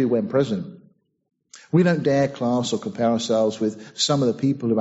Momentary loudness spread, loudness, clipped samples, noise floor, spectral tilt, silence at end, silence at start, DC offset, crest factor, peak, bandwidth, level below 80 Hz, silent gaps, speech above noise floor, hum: 7 LU; -22 LUFS; under 0.1%; -57 dBFS; -5.5 dB/octave; 0 s; 0 s; under 0.1%; 16 dB; -6 dBFS; 8 kHz; -62 dBFS; none; 36 dB; none